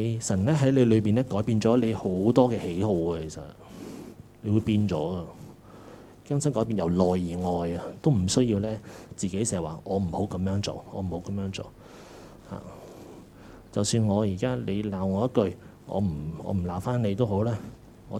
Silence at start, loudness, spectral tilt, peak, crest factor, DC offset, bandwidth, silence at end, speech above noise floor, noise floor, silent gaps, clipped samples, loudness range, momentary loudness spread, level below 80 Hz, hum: 0 s; -27 LUFS; -6.5 dB/octave; -4 dBFS; 22 dB; under 0.1%; 14.5 kHz; 0 s; 22 dB; -48 dBFS; none; under 0.1%; 8 LU; 21 LU; -52 dBFS; none